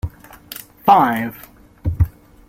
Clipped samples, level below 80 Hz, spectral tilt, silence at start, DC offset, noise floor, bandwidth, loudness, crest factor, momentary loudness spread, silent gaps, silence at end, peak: under 0.1%; -34 dBFS; -6.5 dB/octave; 0.05 s; under 0.1%; -38 dBFS; 16.5 kHz; -18 LUFS; 18 dB; 21 LU; none; 0.4 s; -2 dBFS